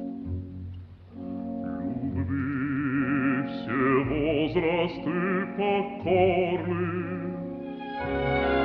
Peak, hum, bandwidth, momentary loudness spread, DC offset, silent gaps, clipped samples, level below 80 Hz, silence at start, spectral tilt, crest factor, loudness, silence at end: -10 dBFS; none; 5.2 kHz; 12 LU; under 0.1%; none; under 0.1%; -48 dBFS; 0 s; -9.5 dB/octave; 18 dB; -28 LUFS; 0 s